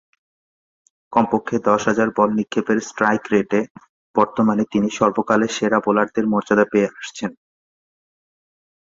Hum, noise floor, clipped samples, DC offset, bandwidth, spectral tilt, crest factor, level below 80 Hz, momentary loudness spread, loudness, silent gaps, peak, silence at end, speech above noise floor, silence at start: none; under -90 dBFS; under 0.1%; under 0.1%; 7.8 kHz; -5.5 dB/octave; 20 dB; -58 dBFS; 6 LU; -19 LUFS; 3.70-3.75 s, 3.89-4.14 s; -2 dBFS; 1.6 s; over 71 dB; 1.1 s